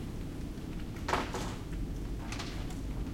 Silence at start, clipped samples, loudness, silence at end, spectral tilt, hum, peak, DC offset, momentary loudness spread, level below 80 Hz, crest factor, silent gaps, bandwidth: 0 s; under 0.1%; -39 LUFS; 0 s; -5.5 dB/octave; none; -16 dBFS; under 0.1%; 8 LU; -42 dBFS; 20 dB; none; 16.5 kHz